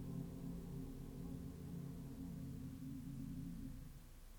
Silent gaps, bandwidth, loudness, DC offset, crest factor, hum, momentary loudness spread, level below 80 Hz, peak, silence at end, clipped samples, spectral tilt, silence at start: none; over 20 kHz; -51 LUFS; under 0.1%; 14 dB; none; 3 LU; -58 dBFS; -36 dBFS; 0 s; under 0.1%; -7.5 dB/octave; 0 s